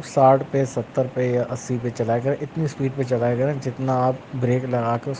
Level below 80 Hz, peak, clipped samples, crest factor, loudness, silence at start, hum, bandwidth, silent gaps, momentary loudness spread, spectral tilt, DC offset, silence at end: -58 dBFS; -4 dBFS; under 0.1%; 18 dB; -22 LUFS; 0 s; none; 9.4 kHz; none; 8 LU; -7.5 dB/octave; under 0.1%; 0 s